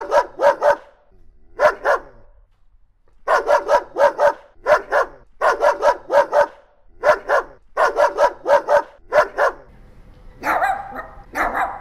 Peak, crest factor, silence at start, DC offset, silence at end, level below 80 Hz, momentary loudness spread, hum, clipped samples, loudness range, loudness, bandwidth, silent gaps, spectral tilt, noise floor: -4 dBFS; 16 dB; 0 s; under 0.1%; 0 s; -46 dBFS; 8 LU; none; under 0.1%; 3 LU; -18 LUFS; 14 kHz; none; -3 dB/octave; -52 dBFS